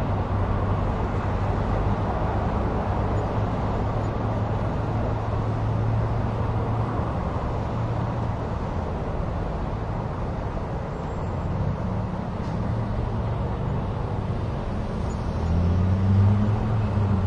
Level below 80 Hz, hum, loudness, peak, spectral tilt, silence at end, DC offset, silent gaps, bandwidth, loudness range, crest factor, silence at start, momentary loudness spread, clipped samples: -32 dBFS; none; -26 LUFS; -10 dBFS; -9 dB/octave; 0 s; under 0.1%; none; 7.4 kHz; 4 LU; 14 dB; 0 s; 6 LU; under 0.1%